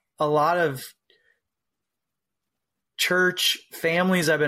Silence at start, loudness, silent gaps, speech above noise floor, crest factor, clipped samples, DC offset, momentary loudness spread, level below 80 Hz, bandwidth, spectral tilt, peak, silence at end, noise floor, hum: 0.2 s; -22 LUFS; none; 63 dB; 16 dB; under 0.1%; under 0.1%; 13 LU; -70 dBFS; 16 kHz; -3.5 dB/octave; -10 dBFS; 0 s; -85 dBFS; none